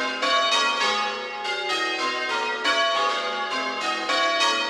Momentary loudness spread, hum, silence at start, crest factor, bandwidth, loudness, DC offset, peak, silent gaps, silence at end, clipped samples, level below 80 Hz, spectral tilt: 6 LU; none; 0 s; 14 dB; 14 kHz; -23 LUFS; under 0.1%; -10 dBFS; none; 0 s; under 0.1%; -68 dBFS; 0 dB/octave